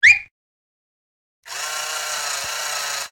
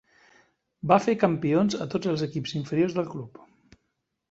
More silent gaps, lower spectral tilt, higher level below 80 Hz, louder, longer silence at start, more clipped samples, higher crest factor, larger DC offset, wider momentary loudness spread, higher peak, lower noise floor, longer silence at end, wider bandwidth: first, 0.31-1.43 s vs none; second, 2.5 dB/octave vs -6.5 dB/octave; about the same, -62 dBFS vs -64 dBFS; first, -21 LUFS vs -26 LUFS; second, 0 s vs 0.85 s; neither; about the same, 20 dB vs 22 dB; neither; second, 10 LU vs 13 LU; about the same, -2 dBFS vs -4 dBFS; first, under -90 dBFS vs -79 dBFS; second, 0.05 s vs 1 s; first, over 20 kHz vs 8 kHz